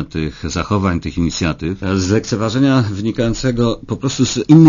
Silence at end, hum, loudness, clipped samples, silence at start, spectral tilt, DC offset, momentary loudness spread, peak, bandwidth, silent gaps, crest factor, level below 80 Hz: 0 s; none; -17 LUFS; 0.2%; 0 s; -6 dB/octave; under 0.1%; 8 LU; 0 dBFS; 7.4 kHz; none; 14 dB; -34 dBFS